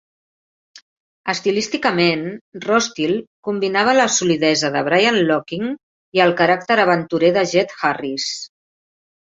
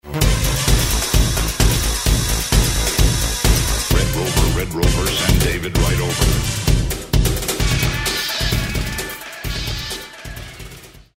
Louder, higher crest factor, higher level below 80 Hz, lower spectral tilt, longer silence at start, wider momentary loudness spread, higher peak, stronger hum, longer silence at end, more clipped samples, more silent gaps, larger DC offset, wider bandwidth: about the same, -17 LUFS vs -18 LUFS; about the same, 18 dB vs 18 dB; second, -62 dBFS vs -22 dBFS; about the same, -3.5 dB/octave vs -3.5 dB/octave; first, 0.75 s vs 0.05 s; about the same, 11 LU vs 10 LU; about the same, -2 dBFS vs 0 dBFS; neither; first, 0.9 s vs 0.2 s; neither; first, 0.82-1.24 s, 2.41-2.52 s, 3.27-3.43 s, 5.83-6.12 s vs none; neither; second, 7.8 kHz vs 16.5 kHz